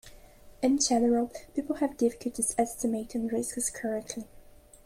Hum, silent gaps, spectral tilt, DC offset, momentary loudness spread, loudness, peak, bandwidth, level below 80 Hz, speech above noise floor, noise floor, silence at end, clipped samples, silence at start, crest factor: none; none; -3 dB/octave; under 0.1%; 11 LU; -29 LUFS; -12 dBFS; 16 kHz; -56 dBFS; 24 dB; -53 dBFS; 0.35 s; under 0.1%; 0.05 s; 18 dB